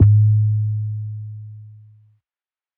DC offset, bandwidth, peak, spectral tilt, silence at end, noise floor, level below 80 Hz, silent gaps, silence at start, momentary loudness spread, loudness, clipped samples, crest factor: under 0.1%; 0.5 kHz; -2 dBFS; -13.5 dB/octave; 1.1 s; under -90 dBFS; -40 dBFS; none; 0 s; 23 LU; -19 LUFS; under 0.1%; 16 dB